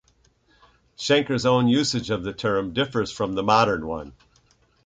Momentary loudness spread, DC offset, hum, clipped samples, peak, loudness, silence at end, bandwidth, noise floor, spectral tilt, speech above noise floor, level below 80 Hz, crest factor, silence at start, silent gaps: 11 LU; under 0.1%; none; under 0.1%; -4 dBFS; -23 LUFS; 0.75 s; 9.4 kHz; -62 dBFS; -5 dB/octave; 39 dB; -52 dBFS; 20 dB; 1 s; none